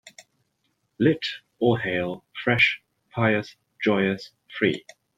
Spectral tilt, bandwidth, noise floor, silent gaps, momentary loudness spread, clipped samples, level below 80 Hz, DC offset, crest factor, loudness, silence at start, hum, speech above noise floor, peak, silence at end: -6.5 dB/octave; 9.6 kHz; -73 dBFS; none; 15 LU; under 0.1%; -62 dBFS; under 0.1%; 20 dB; -24 LUFS; 0.05 s; none; 50 dB; -6 dBFS; 0.4 s